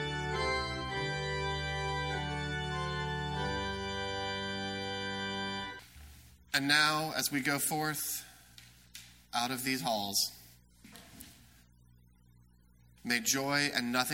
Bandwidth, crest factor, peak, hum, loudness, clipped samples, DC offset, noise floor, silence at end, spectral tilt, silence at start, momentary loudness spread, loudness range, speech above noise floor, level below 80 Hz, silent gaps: 16.5 kHz; 26 dB; -10 dBFS; 60 Hz at -65 dBFS; -33 LUFS; under 0.1%; under 0.1%; -63 dBFS; 0 s; -3 dB/octave; 0 s; 22 LU; 5 LU; 31 dB; -52 dBFS; none